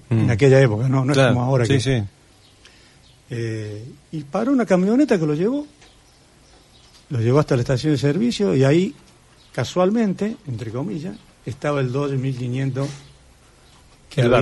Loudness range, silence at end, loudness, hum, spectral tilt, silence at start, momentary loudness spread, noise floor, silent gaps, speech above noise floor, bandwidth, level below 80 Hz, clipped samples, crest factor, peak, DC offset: 5 LU; 0 s; -20 LUFS; none; -7 dB/octave; 0.1 s; 16 LU; -52 dBFS; none; 33 dB; 11.5 kHz; -48 dBFS; under 0.1%; 18 dB; -2 dBFS; under 0.1%